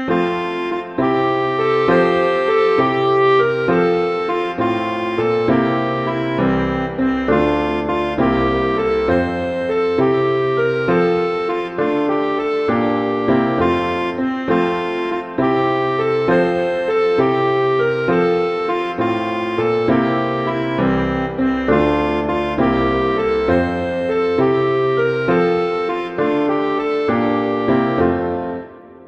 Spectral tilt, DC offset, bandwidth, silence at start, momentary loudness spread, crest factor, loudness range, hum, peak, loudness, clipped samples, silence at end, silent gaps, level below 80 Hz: -8 dB/octave; under 0.1%; 8.2 kHz; 0 s; 5 LU; 14 dB; 2 LU; none; -2 dBFS; -17 LUFS; under 0.1%; 0 s; none; -40 dBFS